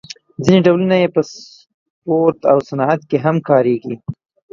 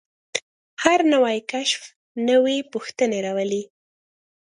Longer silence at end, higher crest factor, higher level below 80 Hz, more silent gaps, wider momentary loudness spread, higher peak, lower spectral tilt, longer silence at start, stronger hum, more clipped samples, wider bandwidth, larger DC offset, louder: second, 0.4 s vs 0.75 s; second, 16 dB vs 22 dB; first, -52 dBFS vs -68 dBFS; second, 1.74-2.02 s vs 0.42-0.77 s, 1.96-2.15 s; first, 16 LU vs 12 LU; about the same, 0 dBFS vs 0 dBFS; first, -7 dB/octave vs -3 dB/octave; about the same, 0.4 s vs 0.35 s; neither; neither; second, 7.6 kHz vs 11 kHz; neither; first, -15 LUFS vs -22 LUFS